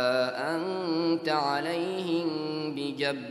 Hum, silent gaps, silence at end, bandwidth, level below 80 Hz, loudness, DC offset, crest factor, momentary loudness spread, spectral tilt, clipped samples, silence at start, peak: none; none; 0 s; 12.5 kHz; -80 dBFS; -29 LUFS; under 0.1%; 16 dB; 5 LU; -5.5 dB/octave; under 0.1%; 0 s; -12 dBFS